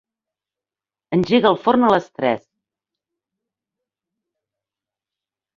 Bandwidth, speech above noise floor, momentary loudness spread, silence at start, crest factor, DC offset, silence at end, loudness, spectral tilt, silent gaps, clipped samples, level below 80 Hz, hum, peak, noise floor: 7.2 kHz; over 73 dB; 7 LU; 1.1 s; 22 dB; under 0.1%; 3.2 s; -18 LUFS; -7 dB/octave; none; under 0.1%; -60 dBFS; none; -2 dBFS; under -90 dBFS